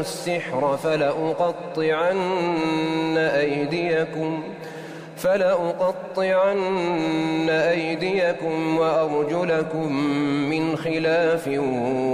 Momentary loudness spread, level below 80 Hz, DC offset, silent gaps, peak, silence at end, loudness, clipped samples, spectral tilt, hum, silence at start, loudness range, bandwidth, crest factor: 5 LU; -62 dBFS; under 0.1%; none; -10 dBFS; 0 s; -22 LUFS; under 0.1%; -6 dB/octave; none; 0 s; 2 LU; 15.5 kHz; 12 dB